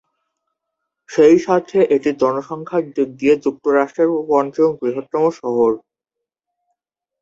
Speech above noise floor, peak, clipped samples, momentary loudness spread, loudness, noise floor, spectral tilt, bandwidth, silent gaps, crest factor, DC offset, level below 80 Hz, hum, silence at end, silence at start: 67 dB; -2 dBFS; under 0.1%; 9 LU; -17 LUFS; -83 dBFS; -6.5 dB/octave; 7.6 kHz; none; 16 dB; under 0.1%; -60 dBFS; none; 1.45 s; 1.1 s